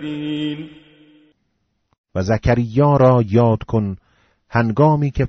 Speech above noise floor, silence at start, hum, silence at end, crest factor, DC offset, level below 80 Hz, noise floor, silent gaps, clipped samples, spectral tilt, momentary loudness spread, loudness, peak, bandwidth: 52 dB; 0 s; none; 0 s; 16 dB; under 0.1%; -38 dBFS; -69 dBFS; 1.98-2.04 s; under 0.1%; -7.5 dB/octave; 15 LU; -17 LUFS; -2 dBFS; 6.6 kHz